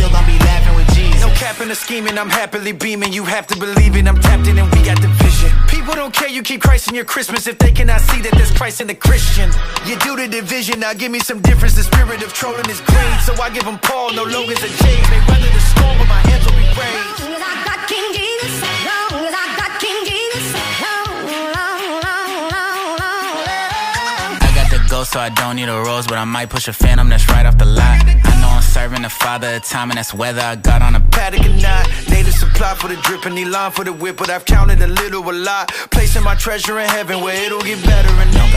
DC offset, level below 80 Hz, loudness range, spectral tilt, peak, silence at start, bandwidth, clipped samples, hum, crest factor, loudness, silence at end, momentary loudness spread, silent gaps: under 0.1%; -12 dBFS; 5 LU; -4.5 dB/octave; 0 dBFS; 0 s; 16 kHz; under 0.1%; none; 12 dB; -15 LUFS; 0 s; 7 LU; none